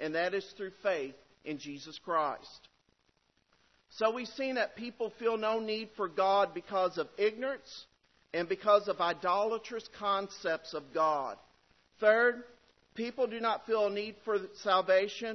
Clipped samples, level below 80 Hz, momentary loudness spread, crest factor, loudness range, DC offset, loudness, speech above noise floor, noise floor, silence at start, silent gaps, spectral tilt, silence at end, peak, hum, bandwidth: under 0.1%; -76 dBFS; 15 LU; 20 dB; 6 LU; under 0.1%; -32 LUFS; 42 dB; -74 dBFS; 0 s; none; -1.5 dB/octave; 0 s; -12 dBFS; none; 6.2 kHz